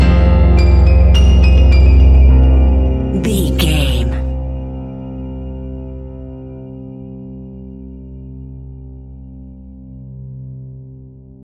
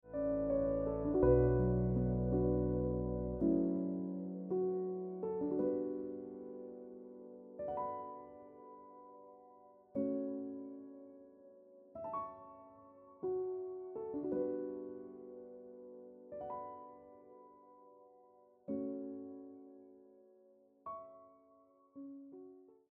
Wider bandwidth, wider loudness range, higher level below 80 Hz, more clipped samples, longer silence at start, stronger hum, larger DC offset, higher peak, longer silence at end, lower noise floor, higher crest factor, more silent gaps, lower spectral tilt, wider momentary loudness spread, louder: first, 12.5 kHz vs 2.6 kHz; first, 22 LU vs 17 LU; first, -14 dBFS vs -52 dBFS; neither; about the same, 0 s vs 0.05 s; neither; neither; first, 0 dBFS vs -18 dBFS; first, 0.5 s vs 0.25 s; second, -37 dBFS vs -68 dBFS; second, 12 dB vs 22 dB; neither; second, -7 dB/octave vs -12.5 dB/octave; about the same, 24 LU vs 23 LU; first, -12 LUFS vs -38 LUFS